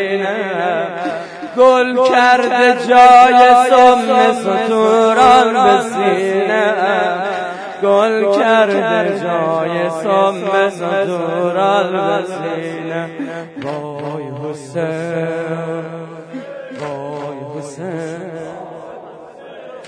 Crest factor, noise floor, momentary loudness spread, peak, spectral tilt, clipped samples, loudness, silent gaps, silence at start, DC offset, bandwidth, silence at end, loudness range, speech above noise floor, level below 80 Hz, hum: 14 dB; -35 dBFS; 19 LU; 0 dBFS; -5 dB/octave; under 0.1%; -13 LUFS; none; 0 s; under 0.1%; 11 kHz; 0 s; 15 LU; 22 dB; -56 dBFS; none